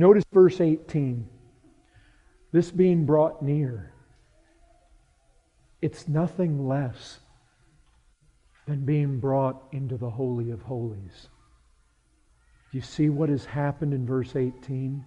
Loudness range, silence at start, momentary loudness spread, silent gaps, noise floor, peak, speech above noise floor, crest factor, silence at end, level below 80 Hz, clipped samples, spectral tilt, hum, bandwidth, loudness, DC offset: 6 LU; 0 s; 16 LU; none; -64 dBFS; -4 dBFS; 40 dB; 22 dB; 0 s; -56 dBFS; under 0.1%; -9 dB/octave; none; 9.2 kHz; -26 LUFS; under 0.1%